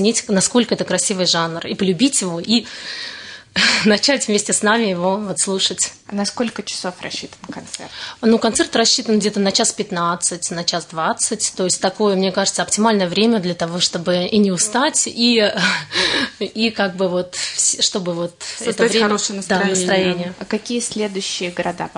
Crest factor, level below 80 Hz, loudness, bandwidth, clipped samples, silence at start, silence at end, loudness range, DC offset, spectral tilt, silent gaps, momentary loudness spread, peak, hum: 16 dB; -58 dBFS; -17 LUFS; 11 kHz; under 0.1%; 0 s; 0.05 s; 3 LU; under 0.1%; -3 dB/octave; none; 10 LU; -2 dBFS; none